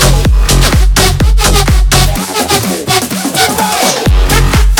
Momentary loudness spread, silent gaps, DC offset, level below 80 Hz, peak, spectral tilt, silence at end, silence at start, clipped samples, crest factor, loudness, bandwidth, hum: 3 LU; none; under 0.1%; -10 dBFS; 0 dBFS; -3.5 dB/octave; 0 s; 0 s; 0.2%; 8 dB; -9 LUFS; 19.5 kHz; none